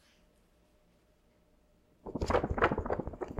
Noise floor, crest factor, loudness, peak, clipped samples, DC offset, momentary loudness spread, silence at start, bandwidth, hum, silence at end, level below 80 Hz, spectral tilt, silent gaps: -68 dBFS; 26 dB; -33 LUFS; -10 dBFS; under 0.1%; under 0.1%; 14 LU; 2.05 s; 13.5 kHz; none; 0 s; -46 dBFS; -6.5 dB/octave; none